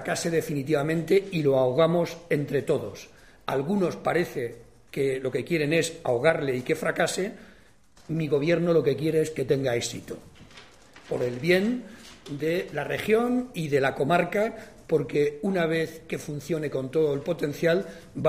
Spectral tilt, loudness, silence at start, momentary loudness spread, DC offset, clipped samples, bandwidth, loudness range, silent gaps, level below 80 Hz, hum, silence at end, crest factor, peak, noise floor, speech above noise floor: -5.5 dB/octave; -26 LUFS; 0 s; 11 LU; 0.1%; under 0.1%; 15.5 kHz; 3 LU; none; -60 dBFS; none; 0 s; 18 dB; -8 dBFS; -57 dBFS; 31 dB